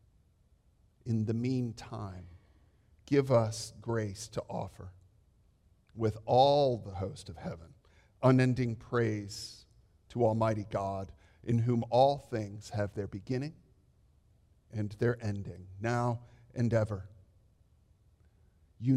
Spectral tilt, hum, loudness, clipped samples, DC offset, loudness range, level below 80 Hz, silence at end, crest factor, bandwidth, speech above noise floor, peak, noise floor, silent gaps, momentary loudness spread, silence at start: -7 dB/octave; none; -32 LUFS; under 0.1%; under 0.1%; 6 LU; -62 dBFS; 0 s; 22 dB; 12 kHz; 36 dB; -12 dBFS; -67 dBFS; none; 18 LU; 1.05 s